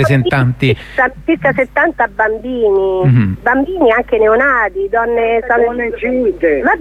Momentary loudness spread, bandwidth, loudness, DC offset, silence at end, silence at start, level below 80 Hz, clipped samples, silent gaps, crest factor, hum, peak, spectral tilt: 4 LU; 10.5 kHz; -13 LUFS; under 0.1%; 0 s; 0 s; -36 dBFS; under 0.1%; none; 12 dB; none; 0 dBFS; -8 dB/octave